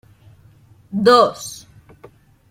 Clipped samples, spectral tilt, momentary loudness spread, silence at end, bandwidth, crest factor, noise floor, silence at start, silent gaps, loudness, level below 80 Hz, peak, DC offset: under 0.1%; -4.5 dB/octave; 21 LU; 0.95 s; 16.5 kHz; 18 dB; -49 dBFS; 0.9 s; none; -15 LUFS; -58 dBFS; -2 dBFS; under 0.1%